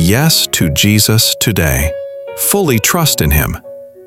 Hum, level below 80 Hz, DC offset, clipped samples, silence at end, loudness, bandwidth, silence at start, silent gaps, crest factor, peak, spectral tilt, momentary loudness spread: none; -24 dBFS; 0.2%; under 0.1%; 0 s; -11 LUFS; 17.5 kHz; 0 s; none; 12 dB; 0 dBFS; -3.5 dB/octave; 10 LU